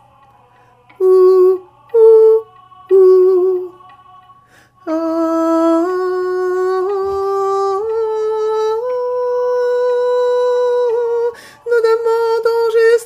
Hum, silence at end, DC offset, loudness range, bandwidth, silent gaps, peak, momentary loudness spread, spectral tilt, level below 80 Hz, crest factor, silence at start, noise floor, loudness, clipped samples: none; 0 s; under 0.1%; 6 LU; 12 kHz; none; 0 dBFS; 9 LU; -5 dB/octave; -60 dBFS; 14 dB; 1 s; -49 dBFS; -14 LUFS; under 0.1%